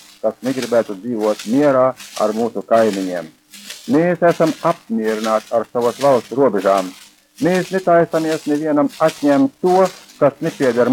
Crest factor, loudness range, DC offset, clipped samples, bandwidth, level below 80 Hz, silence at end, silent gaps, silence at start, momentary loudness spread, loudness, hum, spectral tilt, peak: 16 dB; 2 LU; under 0.1%; under 0.1%; 17.5 kHz; -64 dBFS; 0 s; none; 0.25 s; 7 LU; -17 LUFS; none; -6 dB/octave; -2 dBFS